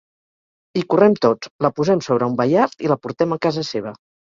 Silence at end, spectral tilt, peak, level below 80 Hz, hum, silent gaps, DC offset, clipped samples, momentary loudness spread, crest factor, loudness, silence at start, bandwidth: 0.4 s; -6.5 dB/octave; -2 dBFS; -60 dBFS; none; 1.51-1.59 s; under 0.1%; under 0.1%; 11 LU; 18 dB; -19 LUFS; 0.75 s; 7.6 kHz